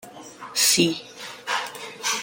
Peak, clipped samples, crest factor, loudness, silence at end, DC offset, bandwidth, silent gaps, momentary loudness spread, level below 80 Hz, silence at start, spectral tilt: -6 dBFS; under 0.1%; 20 dB; -22 LUFS; 0 s; under 0.1%; 17 kHz; none; 21 LU; -68 dBFS; 0.05 s; -1.5 dB/octave